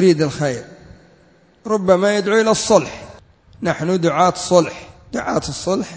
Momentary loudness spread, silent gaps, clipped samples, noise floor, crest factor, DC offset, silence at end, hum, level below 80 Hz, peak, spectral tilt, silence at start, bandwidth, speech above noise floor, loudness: 14 LU; none; under 0.1%; -52 dBFS; 18 dB; under 0.1%; 0 s; none; -48 dBFS; 0 dBFS; -5 dB/octave; 0 s; 8 kHz; 35 dB; -17 LUFS